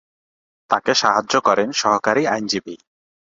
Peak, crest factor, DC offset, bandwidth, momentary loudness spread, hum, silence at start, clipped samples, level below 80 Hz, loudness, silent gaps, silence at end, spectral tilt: -2 dBFS; 20 dB; under 0.1%; 7.8 kHz; 7 LU; none; 0.7 s; under 0.1%; -62 dBFS; -18 LUFS; none; 0.55 s; -2.5 dB/octave